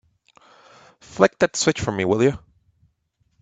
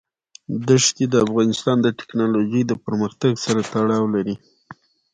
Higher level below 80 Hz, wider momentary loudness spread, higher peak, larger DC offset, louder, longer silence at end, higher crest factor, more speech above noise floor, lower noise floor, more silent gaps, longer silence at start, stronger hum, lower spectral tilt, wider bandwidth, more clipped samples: first, -52 dBFS vs -58 dBFS; first, 12 LU vs 8 LU; about the same, 0 dBFS vs -2 dBFS; neither; about the same, -20 LUFS vs -20 LUFS; first, 1.05 s vs 0.4 s; first, 24 dB vs 18 dB; first, 49 dB vs 26 dB; first, -68 dBFS vs -46 dBFS; neither; first, 1.1 s vs 0.5 s; neither; about the same, -4.5 dB/octave vs -5 dB/octave; about the same, 9.4 kHz vs 9.6 kHz; neither